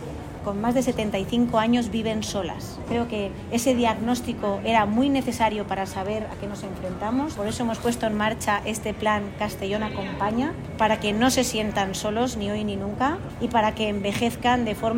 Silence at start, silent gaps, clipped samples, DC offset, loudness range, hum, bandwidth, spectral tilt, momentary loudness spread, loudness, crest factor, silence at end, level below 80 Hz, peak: 0 s; none; under 0.1%; under 0.1%; 2 LU; none; 16 kHz; -4.5 dB/octave; 8 LU; -25 LUFS; 18 dB; 0 s; -44 dBFS; -8 dBFS